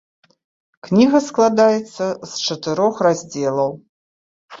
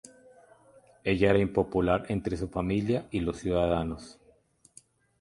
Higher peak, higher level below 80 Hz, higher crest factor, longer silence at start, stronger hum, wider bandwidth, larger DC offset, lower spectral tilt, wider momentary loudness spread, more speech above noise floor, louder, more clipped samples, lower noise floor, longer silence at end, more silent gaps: first, -2 dBFS vs -8 dBFS; second, -62 dBFS vs -46 dBFS; about the same, 18 dB vs 22 dB; first, 0.85 s vs 0.05 s; neither; second, 7.8 kHz vs 11.5 kHz; neither; second, -5 dB/octave vs -7 dB/octave; about the same, 10 LU vs 11 LU; first, over 73 dB vs 35 dB; first, -18 LUFS vs -28 LUFS; neither; first, under -90 dBFS vs -63 dBFS; second, 0.05 s vs 1.1 s; first, 3.89-4.49 s vs none